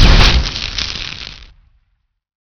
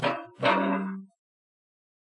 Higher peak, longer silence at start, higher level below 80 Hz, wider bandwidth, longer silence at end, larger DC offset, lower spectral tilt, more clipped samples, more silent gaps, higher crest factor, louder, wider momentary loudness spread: first, 0 dBFS vs -10 dBFS; about the same, 0 s vs 0 s; first, -16 dBFS vs -80 dBFS; second, 5.4 kHz vs 10.5 kHz; second, 1 s vs 1.15 s; neither; second, -4 dB/octave vs -6.5 dB/octave; first, 0.5% vs under 0.1%; neither; second, 14 dB vs 20 dB; first, -14 LUFS vs -27 LUFS; first, 18 LU vs 13 LU